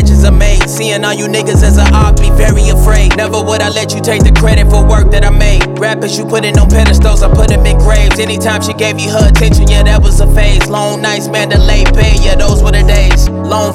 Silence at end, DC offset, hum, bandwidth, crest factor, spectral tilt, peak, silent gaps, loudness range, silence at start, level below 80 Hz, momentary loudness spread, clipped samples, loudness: 0 s; under 0.1%; none; 14.5 kHz; 6 dB; -5 dB/octave; 0 dBFS; none; 1 LU; 0 s; -8 dBFS; 5 LU; under 0.1%; -9 LUFS